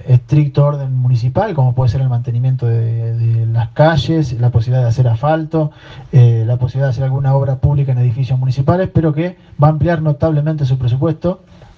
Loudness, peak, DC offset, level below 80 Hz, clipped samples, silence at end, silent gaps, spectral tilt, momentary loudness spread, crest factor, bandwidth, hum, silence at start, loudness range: -15 LUFS; 0 dBFS; under 0.1%; -40 dBFS; under 0.1%; 0.15 s; none; -9 dB/octave; 5 LU; 14 dB; 6.4 kHz; none; 0 s; 1 LU